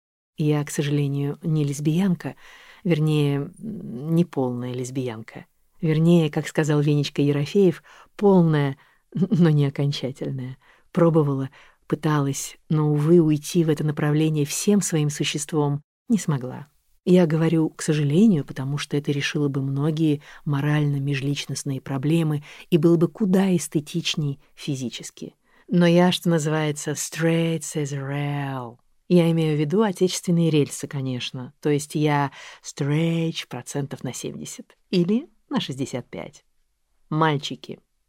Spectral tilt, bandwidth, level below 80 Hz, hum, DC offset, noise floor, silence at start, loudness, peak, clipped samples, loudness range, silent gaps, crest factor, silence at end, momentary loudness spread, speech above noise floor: -6 dB/octave; 15.5 kHz; -60 dBFS; none; under 0.1%; -66 dBFS; 0.4 s; -23 LUFS; -6 dBFS; under 0.1%; 5 LU; 15.84-16.06 s; 18 dB; 0.35 s; 14 LU; 44 dB